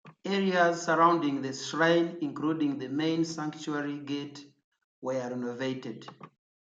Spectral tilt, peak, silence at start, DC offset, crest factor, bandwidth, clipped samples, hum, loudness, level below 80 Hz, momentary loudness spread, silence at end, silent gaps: -5 dB/octave; -10 dBFS; 0.05 s; under 0.1%; 20 dB; 8 kHz; under 0.1%; none; -29 LUFS; -80 dBFS; 15 LU; 0.4 s; 4.64-4.72 s, 4.84-5.02 s